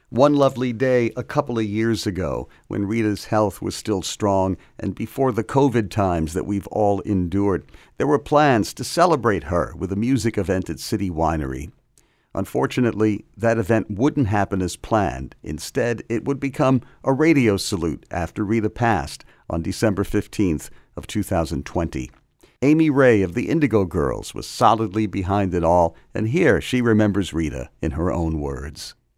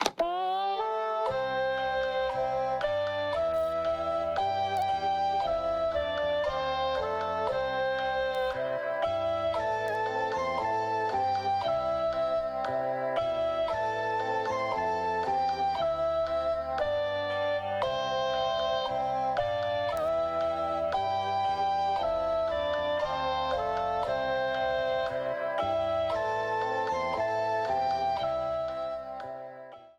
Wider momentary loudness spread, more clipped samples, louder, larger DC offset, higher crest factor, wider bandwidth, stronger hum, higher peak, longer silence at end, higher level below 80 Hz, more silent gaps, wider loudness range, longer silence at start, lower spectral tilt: first, 11 LU vs 2 LU; neither; first, -21 LUFS vs -30 LUFS; neither; about the same, 20 dB vs 20 dB; first, 16 kHz vs 12.5 kHz; neither; first, -2 dBFS vs -10 dBFS; first, 0.25 s vs 0.1 s; first, -40 dBFS vs -54 dBFS; neither; first, 4 LU vs 1 LU; about the same, 0.1 s vs 0 s; first, -6.5 dB/octave vs -4.5 dB/octave